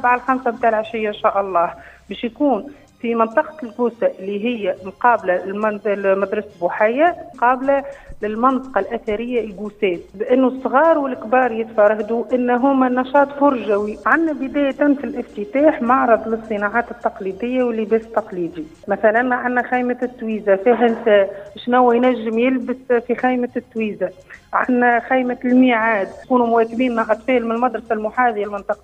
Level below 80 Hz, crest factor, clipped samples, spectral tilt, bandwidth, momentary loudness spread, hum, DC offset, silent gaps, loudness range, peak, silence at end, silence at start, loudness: -52 dBFS; 18 dB; under 0.1%; -7 dB/octave; 8.2 kHz; 9 LU; none; under 0.1%; none; 3 LU; 0 dBFS; 0.1 s; 0 s; -18 LUFS